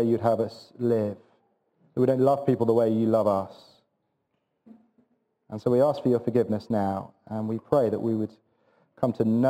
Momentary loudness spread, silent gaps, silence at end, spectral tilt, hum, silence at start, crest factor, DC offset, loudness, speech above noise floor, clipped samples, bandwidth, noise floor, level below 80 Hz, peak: 12 LU; none; 0 s; -9 dB/octave; none; 0 s; 20 dB; under 0.1%; -26 LUFS; 52 dB; under 0.1%; 16 kHz; -76 dBFS; -68 dBFS; -6 dBFS